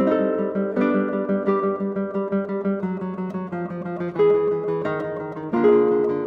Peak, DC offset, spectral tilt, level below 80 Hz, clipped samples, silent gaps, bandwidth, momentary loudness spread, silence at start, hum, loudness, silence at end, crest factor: -6 dBFS; under 0.1%; -10 dB/octave; -66 dBFS; under 0.1%; none; 4.7 kHz; 11 LU; 0 s; none; -23 LUFS; 0 s; 16 dB